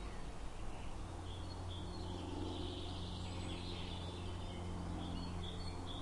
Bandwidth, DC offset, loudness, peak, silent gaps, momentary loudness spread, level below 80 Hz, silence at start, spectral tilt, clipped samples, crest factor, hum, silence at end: 11.5 kHz; under 0.1%; -46 LUFS; -30 dBFS; none; 5 LU; -50 dBFS; 0 s; -5.5 dB/octave; under 0.1%; 14 dB; none; 0 s